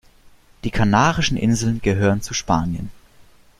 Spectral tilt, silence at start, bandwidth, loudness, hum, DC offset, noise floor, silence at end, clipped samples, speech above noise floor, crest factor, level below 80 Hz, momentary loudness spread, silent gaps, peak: -5 dB/octave; 0.65 s; 14 kHz; -20 LUFS; none; under 0.1%; -49 dBFS; 0.6 s; under 0.1%; 31 dB; 20 dB; -38 dBFS; 13 LU; none; 0 dBFS